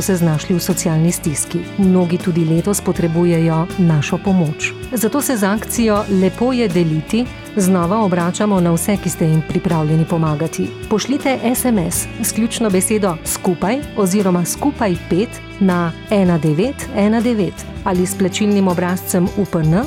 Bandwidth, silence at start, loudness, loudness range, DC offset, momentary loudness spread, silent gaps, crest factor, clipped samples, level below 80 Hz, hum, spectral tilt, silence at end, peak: 17 kHz; 0 s; -16 LUFS; 1 LU; under 0.1%; 5 LU; none; 12 dB; under 0.1%; -40 dBFS; none; -5.5 dB/octave; 0 s; -4 dBFS